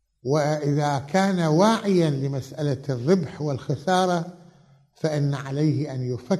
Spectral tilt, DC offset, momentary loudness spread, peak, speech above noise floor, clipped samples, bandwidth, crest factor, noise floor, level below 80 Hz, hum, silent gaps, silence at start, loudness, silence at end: -6.5 dB/octave; under 0.1%; 9 LU; -6 dBFS; 33 dB; under 0.1%; 12.5 kHz; 18 dB; -55 dBFS; -64 dBFS; none; none; 0.25 s; -24 LUFS; 0 s